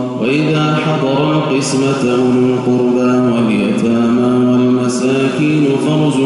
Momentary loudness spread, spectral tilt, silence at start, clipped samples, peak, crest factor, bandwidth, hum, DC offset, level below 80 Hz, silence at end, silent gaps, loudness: 2 LU; -6.5 dB/octave; 0 s; under 0.1%; -2 dBFS; 10 dB; 11.5 kHz; none; under 0.1%; -52 dBFS; 0 s; none; -13 LUFS